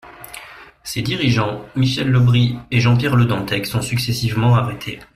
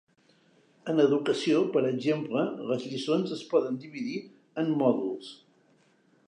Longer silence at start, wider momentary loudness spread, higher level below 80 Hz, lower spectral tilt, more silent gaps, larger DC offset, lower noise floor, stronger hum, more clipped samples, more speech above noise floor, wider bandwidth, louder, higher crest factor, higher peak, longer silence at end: second, 0.05 s vs 0.85 s; first, 16 LU vs 12 LU; first, -44 dBFS vs -82 dBFS; about the same, -6 dB/octave vs -6.5 dB/octave; neither; neither; second, -39 dBFS vs -65 dBFS; neither; neither; second, 22 dB vs 37 dB; first, 15 kHz vs 10 kHz; first, -18 LUFS vs -28 LUFS; about the same, 16 dB vs 20 dB; first, -2 dBFS vs -10 dBFS; second, 0.1 s vs 0.95 s